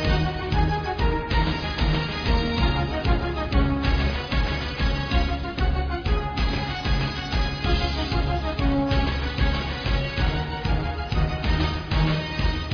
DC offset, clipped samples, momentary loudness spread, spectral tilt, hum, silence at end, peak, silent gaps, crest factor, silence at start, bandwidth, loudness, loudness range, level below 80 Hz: under 0.1%; under 0.1%; 3 LU; -6.5 dB/octave; none; 0 s; -8 dBFS; none; 16 dB; 0 s; 5.4 kHz; -25 LUFS; 1 LU; -26 dBFS